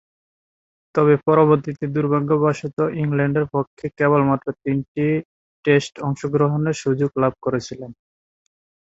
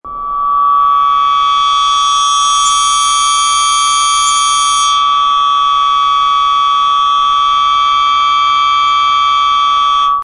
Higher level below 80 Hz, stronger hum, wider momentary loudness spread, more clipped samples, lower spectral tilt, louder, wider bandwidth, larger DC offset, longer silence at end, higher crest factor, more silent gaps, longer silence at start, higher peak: second, -56 dBFS vs -44 dBFS; neither; first, 10 LU vs 1 LU; neither; first, -7.5 dB/octave vs 2.5 dB/octave; second, -20 LUFS vs -9 LUFS; second, 8 kHz vs 11.5 kHz; neither; first, 0.9 s vs 0 s; first, 18 dB vs 10 dB; first, 3.67-3.77 s, 4.88-4.95 s, 5.25-5.63 s vs none; first, 0.95 s vs 0.05 s; about the same, -2 dBFS vs -2 dBFS